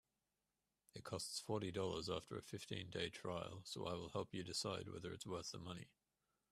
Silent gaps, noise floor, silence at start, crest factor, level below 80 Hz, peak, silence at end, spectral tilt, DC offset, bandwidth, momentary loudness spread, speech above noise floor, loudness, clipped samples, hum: none; under -90 dBFS; 0.95 s; 20 dB; -76 dBFS; -28 dBFS; 0.65 s; -4 dB/octave; under 0.1%; 15 kHz; 8 LU; over 42 dB; -47 LUFS; under 0.1%; none